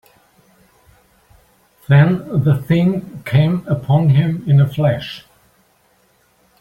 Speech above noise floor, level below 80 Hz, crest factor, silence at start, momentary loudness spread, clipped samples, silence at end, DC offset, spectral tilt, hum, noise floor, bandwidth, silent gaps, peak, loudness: 43 dB; -50 dBFS; 16 dB; 1.9 s; 10 LU; under 0.1%; 1.4 s; under 0.1%; -9 dB/octave; none; -57 dBFS; 5.4 kHz; none; -2 dBFS; -15 LUFS